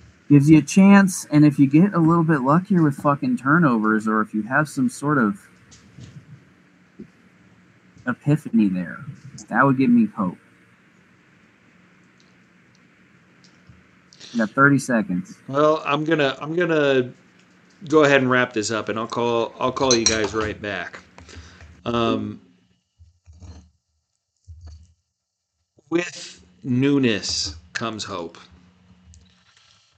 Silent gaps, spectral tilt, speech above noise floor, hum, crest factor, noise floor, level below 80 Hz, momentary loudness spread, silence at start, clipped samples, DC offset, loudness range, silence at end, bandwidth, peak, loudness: none; -5.5 dB/octave; 59 dB; none; 20 dB; -78 dBFS; -54 dBFS; 15 LU; 0.3 s; under 0.1%; under 0.1%; 12 LU; 1.7 s; 13 kHz; 0 dBFS; -19 LUFS